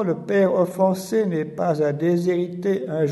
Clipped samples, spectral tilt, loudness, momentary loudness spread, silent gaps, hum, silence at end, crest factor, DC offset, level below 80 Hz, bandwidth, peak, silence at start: under 0.1%; -7.5 dB/octave; -22 LUFS; 4 LU; none; none; 0 s; 14 dB; under 0.1%; -66 dBFS; 12 kHz; -6 dBFS; 0 s